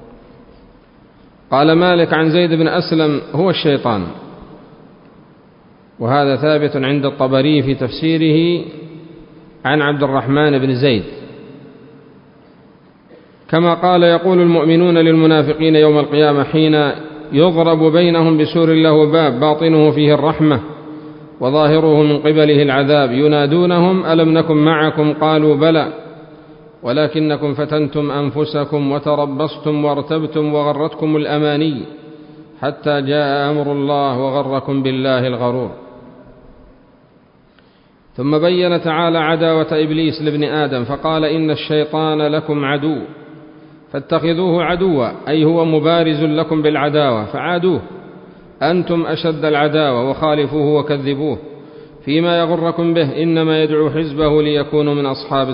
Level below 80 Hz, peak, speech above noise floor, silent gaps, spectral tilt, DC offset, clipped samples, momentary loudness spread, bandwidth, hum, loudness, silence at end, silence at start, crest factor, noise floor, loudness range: -50 dBFS; 0 dBFS; 36 dB; none; -12 dB/octave; under 0.1%; under 0.1%; 9 LU; 5.4 kHz; none; -14 LUFS; 0 s; 0 s; 14 dB; -49 dBFS; 7 LU